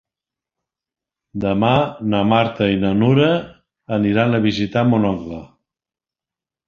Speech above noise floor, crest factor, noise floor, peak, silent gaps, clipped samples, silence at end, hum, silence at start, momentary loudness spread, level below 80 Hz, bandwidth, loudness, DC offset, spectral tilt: 73 dB; 18 dB; -90 dBFS; 0 dBFS; none; under 0.1%; 1.25 s; none; 1.35 s; 9 LU; -48 dBFS; 7 kHz; -18 LUFS; under 0.1%; -8 dB/octave